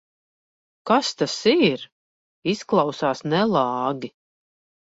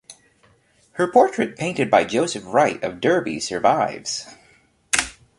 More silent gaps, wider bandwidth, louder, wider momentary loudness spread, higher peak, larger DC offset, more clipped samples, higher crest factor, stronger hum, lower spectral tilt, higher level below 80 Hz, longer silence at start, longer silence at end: first, 1.92-2.42 s vs none; second, 8 kHz vs 11.5 kHz; about the same, -22 LUFS vs -20 LUFS; first, 13 LU vs 9 LU; second, -6 dBFS vs 0 dBFS; neither; neither; about the same, 18 dB vs 20 dB; neither; first, -5 dB/octave vs -3.5 dB/octave; second, -64 dBFS vs -56 dBFS; first, 0.85 s vs 0.1 s; first, 0.75 s vs 0.3 s